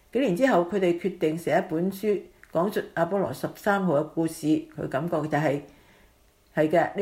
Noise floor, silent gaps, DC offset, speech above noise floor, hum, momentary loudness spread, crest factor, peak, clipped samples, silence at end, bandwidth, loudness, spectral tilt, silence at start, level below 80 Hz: -60 dBFS; none; under 0.1%; 35 dB; none; 7 LU; 18 dB; -8 dBFS; under 0.1%; 0 s; 16 kHz; -26 LUFS; -6.5 dB/octave; 0.15 s; -62 dBFS